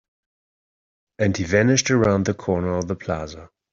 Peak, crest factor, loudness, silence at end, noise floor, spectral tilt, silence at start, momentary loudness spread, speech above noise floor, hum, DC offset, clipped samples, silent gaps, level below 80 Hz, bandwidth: -4 dBFS; 20 dB; -21 LUFS; 0.25 s; under -90 dBFS; -5 dB/octave; 1.2 s; 11 LU; over 69 dB; none; under 0.1%; under 0.1%; none; -50 dBFS; 7.8 kHz